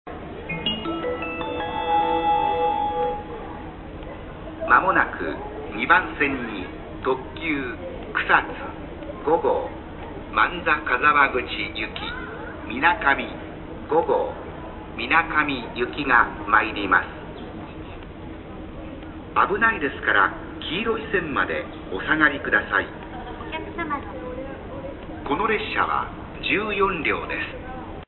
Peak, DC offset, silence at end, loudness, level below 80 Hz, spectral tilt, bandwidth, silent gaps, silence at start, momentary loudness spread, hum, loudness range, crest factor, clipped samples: -2 dBFS; under 0.1%; 0.05 s; -23 LUFS; -42 dBFS; -9.5 dB/octave; 4.3 kHz; none; 0.05 s; 17 LU; none; 3 LU; 24 dB; under 0.1%